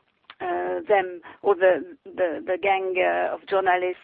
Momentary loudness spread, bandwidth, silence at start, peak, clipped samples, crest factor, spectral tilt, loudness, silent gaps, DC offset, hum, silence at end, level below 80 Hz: 8 LU; 4.6 kHz; 0.3 s; -8 dBFS; under 0.1%; 16 dB; -8.5 dB/octave; -24 LUFS; none; under 0.1%; none; 0.1 s; -68 dBFS